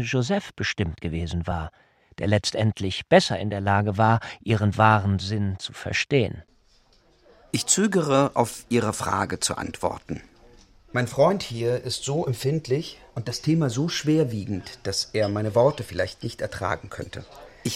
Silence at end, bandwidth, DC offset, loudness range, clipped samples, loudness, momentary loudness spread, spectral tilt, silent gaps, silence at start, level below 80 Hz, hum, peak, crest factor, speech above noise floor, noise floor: 0 s; 16 kHz; under 0.1%; 4 LU; under 0.1%; -24 LUFS; 12 LU; -5 dB/octave; none; 0 s; -48 dBFS; none; -2 dBFS; 22 dB; 35 dB; -59 dBFS